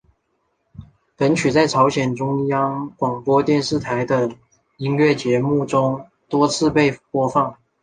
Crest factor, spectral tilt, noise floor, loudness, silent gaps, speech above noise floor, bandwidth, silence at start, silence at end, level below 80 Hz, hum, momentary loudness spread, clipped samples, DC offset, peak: 18 dB; -6 dB/octave; -69 dBFS; -19 LUFS; none; 51 dB; 9.8 kHz; 0.8 s; 0.3 s; -52 dBFS; none; 7 LU; under 0.1%; under 0.1%; -2 dBFS